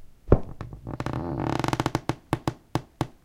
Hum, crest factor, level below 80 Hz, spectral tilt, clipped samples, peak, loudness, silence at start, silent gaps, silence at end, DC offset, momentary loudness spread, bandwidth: none; 26 dB; -36 dBFS; -6.5 dB/octave; under 0.1%; -2 dBFS; -29 LUFS; 0 s; none; 0.15 s; under 0.1%; 10 LU; 17 kHz